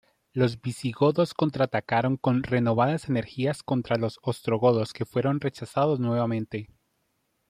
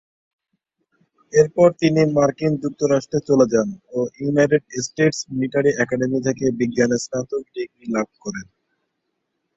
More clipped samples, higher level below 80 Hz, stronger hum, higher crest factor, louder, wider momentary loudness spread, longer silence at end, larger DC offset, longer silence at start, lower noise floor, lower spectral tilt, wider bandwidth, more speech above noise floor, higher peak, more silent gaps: neither; about the same, -62 dBFS vs -58 dBFS; neither; about the same, 18 dB vs 20 dB; second, -26 LUFS vs -20 LUFS; second, 7 LU vs 11 LU; second, 0.85 s vs 1.15 s; neither; second, 0.35 s vs 1.35 s; about the same, -74 dBFS vs -75 dBFS; first, -7.5 dB/octave vs -5.5 dB/octave; first, 14 kHz vs 8.2 kHz; second, 49 dB vs 56 dB; second, -8 dBFS vs -2 dBFS; neither